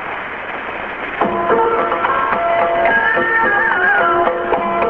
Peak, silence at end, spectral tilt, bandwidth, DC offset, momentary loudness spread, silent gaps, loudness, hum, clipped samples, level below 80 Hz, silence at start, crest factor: 0 dBFS; 0 s; -7 dB/octave; 6 kHz; under 0.1%; 11 LU; none; -15 LUFS; none; under 0.1%; -46 dBFS; 0 s; 16 dB